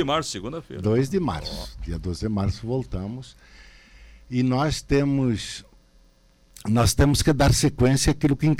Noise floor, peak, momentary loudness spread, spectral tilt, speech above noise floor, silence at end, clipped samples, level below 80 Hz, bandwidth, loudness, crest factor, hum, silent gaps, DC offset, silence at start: -57 dBFS; -8 dBFS; 15 LU; -5.5 dB/octave; 34 dB; 0 s; under 0.1%; -36 dBFS; 16.5 kHz; -23 LUFS; 16 dB; none; none; under 0.1%; 0 s